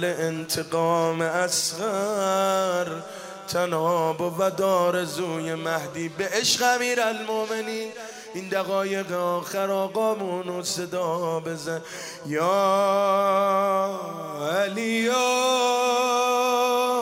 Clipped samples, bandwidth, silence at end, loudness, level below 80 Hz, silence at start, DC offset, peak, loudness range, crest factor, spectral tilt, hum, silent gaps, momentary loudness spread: under 0.1%; 16 kHz; 0 s; -24 LUFS; -72 dBFS; 0 s; under 0.1%; -8 dBFS; 4 LU; 16 dB; -3.5 dB/octave; none; none; 10 LU